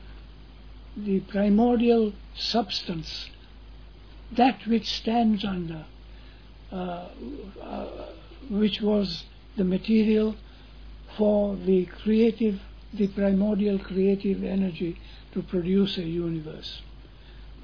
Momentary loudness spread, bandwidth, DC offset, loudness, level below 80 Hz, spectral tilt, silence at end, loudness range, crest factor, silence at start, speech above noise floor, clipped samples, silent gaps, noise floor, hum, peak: 17 LU; 5.4 kHz; 0.2%; -26 LUFS; -46 dBFS; -7.5 dB/octave; 0 s; 6 LU; 18 dB; 0 s; 21 dB; under 0.1%; none; -46 dBFS; none; -8 dBFS